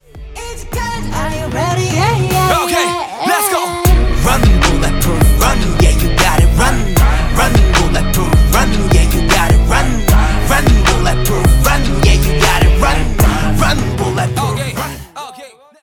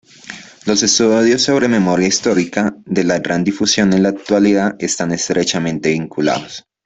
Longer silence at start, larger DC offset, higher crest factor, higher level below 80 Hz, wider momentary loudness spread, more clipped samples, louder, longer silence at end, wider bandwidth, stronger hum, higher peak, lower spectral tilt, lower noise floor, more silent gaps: about the same, 0.15 s vs 0.25 s; neither; about the same, 12 dB vs 14 dB; first, -14 dBFS vs -52 dBFS; about the same, 9 LU vs 7 LU; neither; about the same, -13 LUFS vs -15 LUFS; about the same, 0.35 s vs 0.25 s; first, 18.5 kHz vs 8.4 kHz; neither; about the same, 0 dBFS vs -2 dBFS; about the same, -4.5 dB/octave vs -4 dB/octave; about the same, -37 dBFS vs -35 dBFS; neither